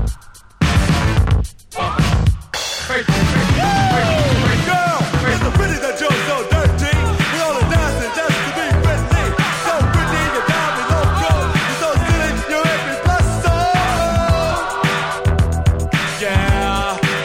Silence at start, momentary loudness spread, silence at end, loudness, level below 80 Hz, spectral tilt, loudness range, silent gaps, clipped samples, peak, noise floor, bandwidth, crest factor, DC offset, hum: 0 s; 4 LU; 0 s; -16 LUFS; -24 dBFS; -5 dB/octave; 1 LU; none; under 0.1%; -2 dBFS; -36 dBFS; 16 kHz; 14 dB; under 0.1%; none